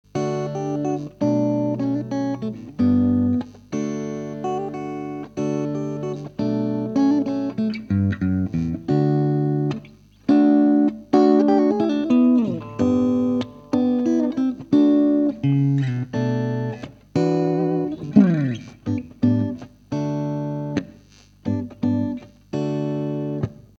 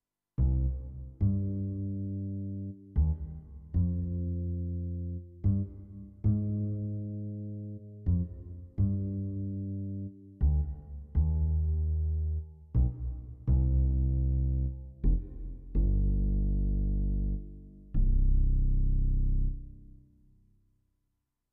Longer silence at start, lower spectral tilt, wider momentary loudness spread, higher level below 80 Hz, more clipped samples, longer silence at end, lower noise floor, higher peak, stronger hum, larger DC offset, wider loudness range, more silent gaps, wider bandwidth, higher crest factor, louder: second, 0.15 s vs 0.4 s; second, -8.5 dB/octave vs -15.5 dB/octave; about the same, 12 LU vs 11 LU; second, -54 dBFS vs -32 dBFS; neither; second, 0.25 s vs 1.7 s; second, -50 dBFS vs -81 dBFS; first, 0 dBFS vs -16 dBFS; first, 50 Hz at -50 dBFS vs none; neither; first, 8 LU vs 4 LU; neither; first, 7.2 kHz vs 1.3 kHz; first, 20 dB vs 14 dB; first, -22 LUFS vs -33 LUFS